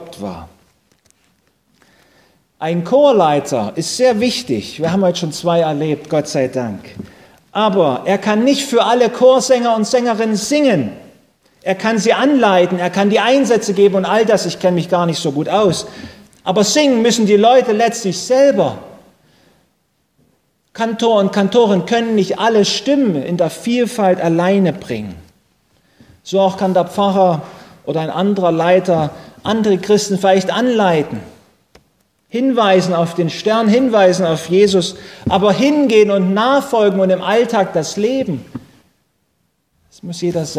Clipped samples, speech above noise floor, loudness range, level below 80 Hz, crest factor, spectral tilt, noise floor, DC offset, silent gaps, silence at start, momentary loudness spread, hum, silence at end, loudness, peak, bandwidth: under 0.1%; 51 dB; 5 LU; -52 dBFS; 14 dB; -5 dB/octave; -65 dBFS; under 0.1%; none; 0 s; 12 LU; none; 0 s; -14 LUFS; 0 dBFS; 16 kHz